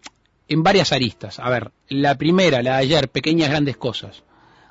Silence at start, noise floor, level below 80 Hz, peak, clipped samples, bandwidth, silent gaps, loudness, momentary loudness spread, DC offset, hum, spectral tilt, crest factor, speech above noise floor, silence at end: 0.05 s; -46 dBFS; -50 dBFS; -4 dBFS; under 0.1%; 8 kHz; none; -19 LUFS; 11 LU; under 0.1%; none; -5.5 dB/octave; 16 dB; 27 dB; 0.6 s